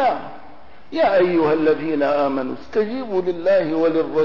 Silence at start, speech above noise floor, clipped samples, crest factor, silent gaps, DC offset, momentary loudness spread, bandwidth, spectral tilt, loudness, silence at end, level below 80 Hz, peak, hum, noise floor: 0 s; 27 dB; under 0.1%; 10 dB; none; 2%; 8 LU; 6 kHz; -7.5 dB/octave; -19 LUFS; 0 s; -56 dBFS; -8 dBFS; none; -45 dBFS